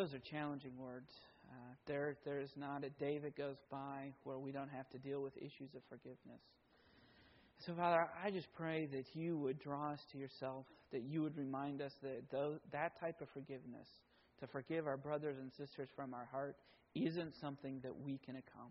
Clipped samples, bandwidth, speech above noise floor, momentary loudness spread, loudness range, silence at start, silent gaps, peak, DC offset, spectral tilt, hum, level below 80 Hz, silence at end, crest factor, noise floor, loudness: under 0.1%; 5.6 kHz; 25 dB; 14 LU; 7 LU; 0 s; none; -22 dBFS; under 0.1%; -5.5 dB/octave; none; -82 dBFS; 0 s; 24 dB; -71 dBFS; -46 LUFS